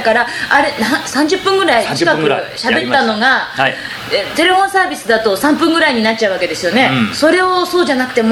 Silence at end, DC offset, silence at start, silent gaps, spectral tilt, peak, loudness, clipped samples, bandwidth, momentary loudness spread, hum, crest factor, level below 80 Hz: 0 s; under 0.1%; 0 s; none; -3.5 dB/octave; 0 dBFS; -13 LUFS; under 0.1%; 18 kHz; 5 LU; none; 12 dB; -50 dBFS